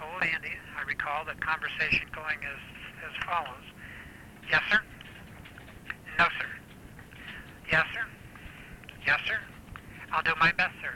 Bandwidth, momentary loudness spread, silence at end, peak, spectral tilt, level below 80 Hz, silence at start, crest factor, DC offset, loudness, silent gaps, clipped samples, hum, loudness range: 18 kHz; 22 LU; 0 s; -12 dBFS; -4 dB/octave; -54 dBFS; 0 s; 20 dB; under 0.1%; -29 LUFS; none; under 0.1%; none; 2 LU